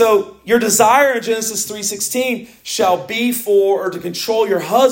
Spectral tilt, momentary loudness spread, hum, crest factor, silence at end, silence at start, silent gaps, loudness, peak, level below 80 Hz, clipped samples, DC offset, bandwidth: -2.5 dB/octave; 9 LU; none; 16 dB; 0 s; 0 s; none; -16 LUFS; 0 dBFS; -60 dBFS; under 0.1%; under 0.1%; 17 kHz